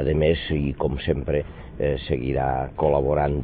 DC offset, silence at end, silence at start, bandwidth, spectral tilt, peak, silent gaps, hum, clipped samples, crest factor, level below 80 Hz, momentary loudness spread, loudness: under 0.1%; 0 s; 0 s; 4.7 kHz; -11.5 dB/octave; -6 dBFS; none; none; under 0.1%; 16 dB; -34 dBFS; 6 LU; -24 LUFS